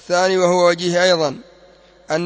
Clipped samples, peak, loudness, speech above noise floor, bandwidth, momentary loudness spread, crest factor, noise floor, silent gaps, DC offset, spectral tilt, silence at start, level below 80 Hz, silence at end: under 0.1%; -2 dBFS; -16 LUFS; 32 dB; 8 kHz; 9 LU; 16 dB; -48 dBFS; none; under 0.1%; -4 dB/octave; 0.1 s; -60 dBFS; 0 s